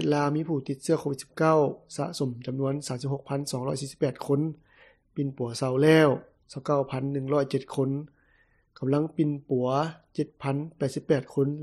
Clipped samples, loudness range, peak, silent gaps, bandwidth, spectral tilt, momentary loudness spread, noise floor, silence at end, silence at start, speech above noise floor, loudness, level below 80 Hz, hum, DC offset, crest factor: under 0.1%; 5 LU; -8 dBFS; none; 13 kHz; -6.5 dB/octave; 11 LU; -65 dBFS; 0 s; 0 s; 38 dB; -28 LUFS; -66 dBFS; none; under 0.1%; 18 dB